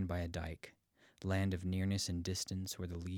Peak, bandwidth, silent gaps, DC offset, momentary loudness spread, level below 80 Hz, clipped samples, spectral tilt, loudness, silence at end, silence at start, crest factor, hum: -24 dBFS; 17.5 kHz; none; under 0.1%; 10 LU; -60 dBFS; under 0.1%; -5 dB/octave; -39 LUFS; 0 s; 0 s; 16 dB; none